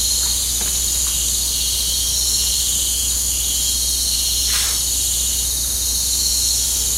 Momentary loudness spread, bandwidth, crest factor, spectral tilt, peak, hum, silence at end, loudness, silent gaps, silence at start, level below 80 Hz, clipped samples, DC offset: 2 LU; 16 kHz; 16 dB; 0 dB/octave; -4 dBFS; none; 0 s; -16 LUFS; none; 0 s; -30 dBFS; under 0.1%; under 0.1%